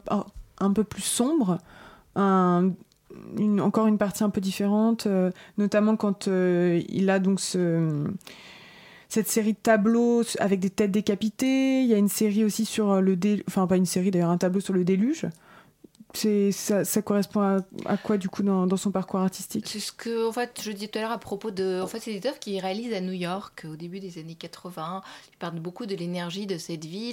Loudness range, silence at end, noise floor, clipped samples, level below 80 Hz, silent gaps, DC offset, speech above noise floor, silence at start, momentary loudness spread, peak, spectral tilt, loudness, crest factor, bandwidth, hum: 9 LU; 0 s; -53 dBFS; under 0.1%; -62 dBFS; none; under 0.1%; 28 dB; 0.05 s; 13 LU; -8 dBFS; -5.5 dB/octave; -25 LUFS; 16 dB; 17 kHz; none